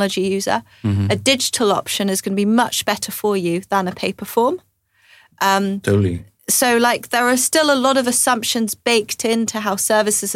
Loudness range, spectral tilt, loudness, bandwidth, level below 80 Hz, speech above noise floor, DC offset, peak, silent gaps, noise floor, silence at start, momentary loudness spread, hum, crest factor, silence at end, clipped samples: 4 LU; -3.5 dB/octave; -17 LUFS; 17 kHz; -58 dBFS; 35 dB; under 0.1%; -4 dBFS; none; -53 dBFS; 0 s; 6 LU; none; 16 dB; 0 s; under 0.1%